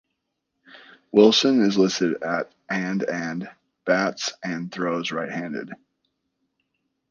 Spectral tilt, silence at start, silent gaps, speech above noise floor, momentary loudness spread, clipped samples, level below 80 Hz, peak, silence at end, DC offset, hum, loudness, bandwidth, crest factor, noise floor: -4.5 dB/octave; 0.75 s; none; 56 dB; 16 LU; under 0.1%; -70 dBFS; -2 dBFS; 1.35 s; under 0.1%; none; -22 LUFS; 7.4 kHz; 22 dB; -78 dBFS